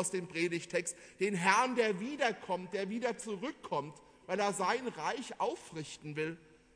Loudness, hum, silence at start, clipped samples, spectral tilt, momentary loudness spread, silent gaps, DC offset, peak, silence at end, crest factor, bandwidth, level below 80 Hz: -35 LUFS; none; 0 s; under 0.1%; -4 dB/octave; 13 LU; none; under 0.1%; -12 dBFS; 0.4 s; 24 dB; 11 kHz; -74 dBFS